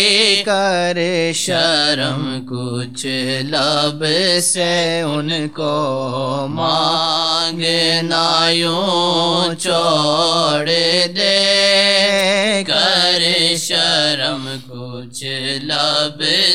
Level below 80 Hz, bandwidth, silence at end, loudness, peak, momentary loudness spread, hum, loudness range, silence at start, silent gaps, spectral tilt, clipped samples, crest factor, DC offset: -62 dBFS; 16 kHz; 0 s; -15 LUFS; 0 dBFS; 10 LU; none; 4 LU; 0 s; none; -3 dB/octave; under 0.1%; 16 dB; 0.7%